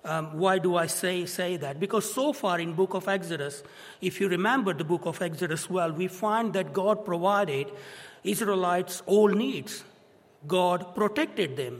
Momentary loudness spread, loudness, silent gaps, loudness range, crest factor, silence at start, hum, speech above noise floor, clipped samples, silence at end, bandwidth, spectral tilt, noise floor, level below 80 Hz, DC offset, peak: 9 LU; -27 LUFS; none; 2 LU; 18 dB; 0.05 s; none; 31 dB; under 0.1%; 0 s; 16 kHz; -4.5 dB/octave; -58 dBFS; -76 dBFS; under 0.1%; -10 dBFS